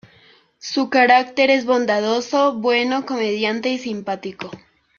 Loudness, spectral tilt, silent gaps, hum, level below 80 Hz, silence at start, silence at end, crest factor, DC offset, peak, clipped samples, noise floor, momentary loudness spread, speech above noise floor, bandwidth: -18 LUFS; -4 dB/octave; none; none; -66 dBFS; 0.65 s; 0.4 s; 18 dB; under 0.1%; -2 dBFS; under 0.1%; -53 dBFS; 13 LU; 34 dB; 7.2 kHz